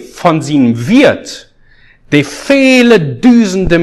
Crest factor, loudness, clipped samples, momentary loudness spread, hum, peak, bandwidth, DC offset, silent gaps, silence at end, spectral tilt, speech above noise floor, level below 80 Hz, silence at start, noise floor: 10 dB; -9 LUFS; 1%; 7 LU; none; 0 dBFS; 12.5 kHz; under 0.1%; none; 0 s; -5.5 dB/octave; 35 dB; -34 dBFS; 0 s; -43 dBFS